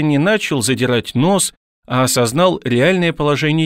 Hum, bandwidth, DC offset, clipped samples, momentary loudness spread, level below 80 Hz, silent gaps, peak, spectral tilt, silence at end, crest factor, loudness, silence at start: none; 16 kHz; 0.3%; under 0.1%; 3 LU; -48 dBFS; 1.57-1.83 s; -2 dBFS; -4.5 dB/octave; 0 s; 14 dB; -15 LUFS; 0 s